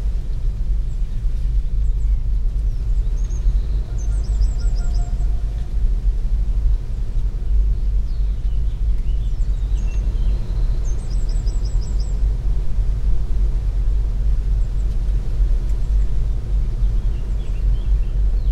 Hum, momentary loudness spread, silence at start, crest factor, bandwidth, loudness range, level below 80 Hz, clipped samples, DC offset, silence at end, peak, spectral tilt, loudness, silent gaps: none; 3 LU; 0 s; 12 dB; 8.2 kHz; 1 LU; -18 dBFS; under 0.1%; under 0.1%; 0 s; -6 dBFS; -7 dB/octave; -24 LUFS; none